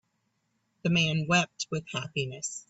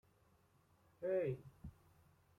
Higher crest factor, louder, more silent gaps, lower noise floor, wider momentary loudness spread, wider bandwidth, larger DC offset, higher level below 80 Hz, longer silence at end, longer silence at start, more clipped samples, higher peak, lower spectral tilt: about the same, 20 dB vs 18 dB; first, -28 LUFS vs -43 LUFS; neither; about the same, -76 dBFS vs -74 dBFS; second, 9 LU vs 19 LU; second, 8.2 kHz vs 14 kHz; neither; about the same, -66 dBFS vs -70 dBFS; second, 0.1 s vs 0.7 s; second, 0.85 s vs 1 s; neither; first, -12 dBFS vs -30 dBFS; second, -4 dB/octave vs -9 dB/octave